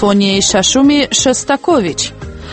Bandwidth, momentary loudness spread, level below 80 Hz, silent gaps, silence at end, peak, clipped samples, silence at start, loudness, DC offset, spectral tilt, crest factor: 8.8 kHz; 9 LU; -36 dBFS; none; 0 s; 0 dBFS; under 0.1%; 0 s; -11 LUFS; under 0.1%; -3 dB/octave; 12 dB